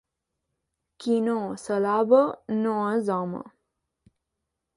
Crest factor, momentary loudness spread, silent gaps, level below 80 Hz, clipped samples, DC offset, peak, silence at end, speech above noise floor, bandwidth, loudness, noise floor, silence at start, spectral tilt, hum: 20 dB; 12 LU; none; -70 dBFS; under 0.1%; under 0.1%; -8 dBFS; 1.3 s; 59 dB; 11.5 kHz; -25 LUFS; -83 dBFS; 1 s; -7 dB/octave; none